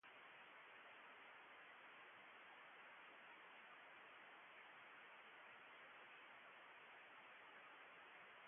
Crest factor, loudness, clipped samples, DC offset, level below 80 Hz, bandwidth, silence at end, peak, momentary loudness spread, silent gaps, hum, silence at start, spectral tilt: 12 dB; -62 LUFS; under 0.1%; under 0.1%; under -90 dBFS; 3.6 kHz; 0 s; -52 dBFS; 0 LU; none; none; 0.05 s; 3.5 dB/octave